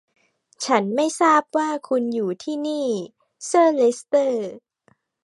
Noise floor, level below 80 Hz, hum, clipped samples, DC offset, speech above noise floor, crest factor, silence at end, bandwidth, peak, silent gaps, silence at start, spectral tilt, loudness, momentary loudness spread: -63 dBFS; -80 dBFS; none; under 0.1%; under 0.1%; 42 dB; 20 dB; 0.65 s; 11.5 kHz; -2 dBFS; none; 0.6 s; -4 dB/octave; -21 LUFS; 12 LU